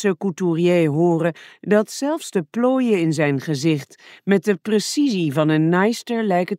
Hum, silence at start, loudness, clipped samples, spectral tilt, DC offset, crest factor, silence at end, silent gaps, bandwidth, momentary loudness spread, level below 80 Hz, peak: none; 0 s; -20 LUFS; under 0.1%; -6 dB/octave; under 0.1%; 16 dB; 0 s; none; 16 kHz; 7 LU; -70 dBFS; -4 dBFS